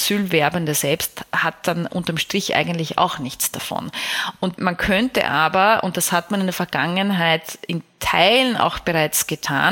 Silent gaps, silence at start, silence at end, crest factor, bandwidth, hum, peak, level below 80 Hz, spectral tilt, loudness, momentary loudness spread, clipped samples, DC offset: none; 0 s; 0 s; 20 dB; 17 kHz; none; 0 dBFS; -48 dBFS; -3.5 dB/octave; -19 LUFS; 8 LU; under 0.1%; under 0.1%